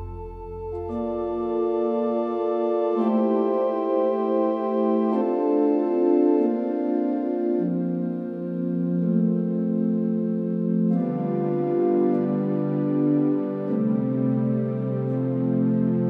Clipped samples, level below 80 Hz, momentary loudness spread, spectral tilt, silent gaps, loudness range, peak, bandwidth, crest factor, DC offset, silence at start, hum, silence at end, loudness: under 0.1%; -52 dBFS; 6 LU; -11.5 dB/octave; none; 3 LU; -10 dBFS; 4.4 kHz; 14 dB; under 0.1%; 0 s; none; 0 s; -24 LUFS